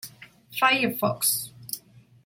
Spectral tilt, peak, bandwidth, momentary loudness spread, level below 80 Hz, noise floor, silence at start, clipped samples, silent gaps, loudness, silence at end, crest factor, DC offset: -2 dB/octave; -8 dBFS; 17 kHz; 15 LU; -68 dBFS; -51 dBFS; 0.05 s; under 0.1%; none; -24 LUFS; 0.45 s; 20 dB; under 0.1%